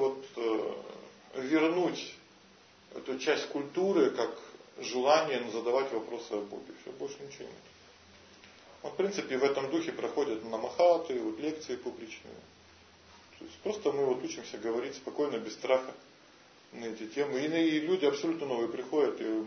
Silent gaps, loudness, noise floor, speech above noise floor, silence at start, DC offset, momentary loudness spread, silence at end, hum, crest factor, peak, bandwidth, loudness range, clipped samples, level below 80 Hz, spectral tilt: none; -32 LUFS; -59 dBFS; 27 dB; 0 s; under 0.1%; 19 LU; 0 s; none; 20 dB; -12 dBFS; 6.6 kHz; 6 LU; under 0.1%; -76 dBFS; -4.5 dB/octave